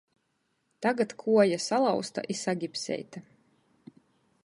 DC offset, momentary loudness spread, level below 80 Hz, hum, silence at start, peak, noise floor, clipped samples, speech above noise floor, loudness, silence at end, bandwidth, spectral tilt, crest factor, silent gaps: under 0.1%; 12 LU; -78 dBFS; none; 0.8 s; -10 dBFS; -76 dBFS; under 0.1%; 48 dB; -28 LUFS; 1.25 s; 11.5 kHz; -4.5 dB/octave; 20 dB; none